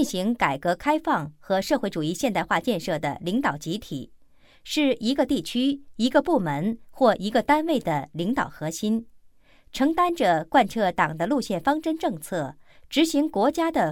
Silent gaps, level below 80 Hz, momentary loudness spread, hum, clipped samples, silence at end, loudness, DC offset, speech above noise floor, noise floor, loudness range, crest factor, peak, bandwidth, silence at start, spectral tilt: none; -54 dBFS; 8 LU; none; under 0.1%; 0 s; -24 LUFS; under 0.1%; 29 dB; -53 dBFS; 3 LU; 18 dB; -6 dBFS; 18 kHz; 0 s; -5 dB/octave